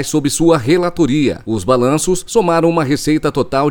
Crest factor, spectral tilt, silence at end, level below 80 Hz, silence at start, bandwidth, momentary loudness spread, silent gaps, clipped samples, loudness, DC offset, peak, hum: 14 dB; -5.5 dB/octave; 0 s; -38 dBFS; 0 s; 19 kHz; 3 LU; none; under 0.1%; -14 LUFS; under 0.1%; 0 dBFS; none